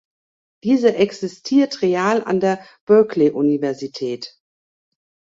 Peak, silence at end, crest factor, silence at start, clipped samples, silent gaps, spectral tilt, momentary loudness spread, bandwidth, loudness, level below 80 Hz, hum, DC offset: -2 dBFS; 1.05 s; 16 dB; 0.65 s; under 0.1%; 2.81-2.87 s; -6 dB/octave; 12 LU; 7.8 kHz; -18 LUFS; -64 dBFS; none; under 0.1%